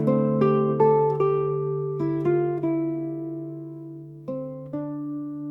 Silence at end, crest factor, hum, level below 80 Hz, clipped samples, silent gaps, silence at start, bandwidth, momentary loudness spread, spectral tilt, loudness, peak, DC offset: 0 s; 16 dB; none; -66 dBFS; under 0.1%; none; 0 s; 5.4 kHz; 16 LU; -11 dB/octave; -25 LUFS; -8 dBFS; under 0.1%